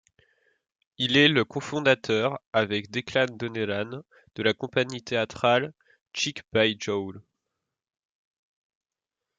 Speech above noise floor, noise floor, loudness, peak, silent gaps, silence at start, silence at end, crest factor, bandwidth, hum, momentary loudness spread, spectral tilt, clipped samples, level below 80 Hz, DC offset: 63 dB; -89 dBFS; -25 LUFS; -4 dBFS; 2.46-2.53 s, 6.01-6.06 s; 1 s; 2.2 s; 24 dB; 9.2 kHz; none; 11 LU; -4.5 dB/octave; under 0.1%; -68 dBFS; under 0.1%